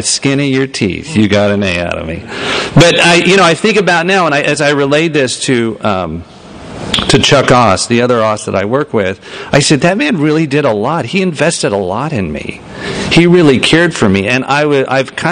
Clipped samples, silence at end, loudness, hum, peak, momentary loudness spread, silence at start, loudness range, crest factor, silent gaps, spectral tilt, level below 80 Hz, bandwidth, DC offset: 0.4%; 0 s; -10 LUFS; none; 0 dBFS; 11 LU; 0 s; 3 LU; 10 dB; none; -4.5 dB/octave; -36 dBFS; 11.5 kHz; under 0.1%